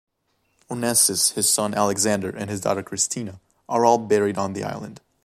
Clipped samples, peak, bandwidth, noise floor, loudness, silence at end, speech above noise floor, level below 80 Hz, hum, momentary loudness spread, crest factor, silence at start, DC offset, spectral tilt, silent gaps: under 0.1%; -2 dBFS; 15.5 kHz; -70 dBFS; -21 LUFS; 0.25 s; 48 dB; -62 dBFS; none; 14 LU; 22 dB; 0.7 s; under 0.1%; -3 dB/octave; none